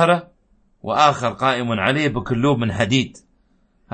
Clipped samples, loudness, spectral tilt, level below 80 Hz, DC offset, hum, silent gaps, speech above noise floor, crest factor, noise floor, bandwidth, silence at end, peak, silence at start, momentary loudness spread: under 0.1%; -19 LUFS; -5.5 dB/octave; -50 dBFS; under 0.1%; none; none; 42 dB; 18 dB; -60 dBFS; 8.8 kHz; 0.85 s; -2 dBFS; 0 s; 6 LU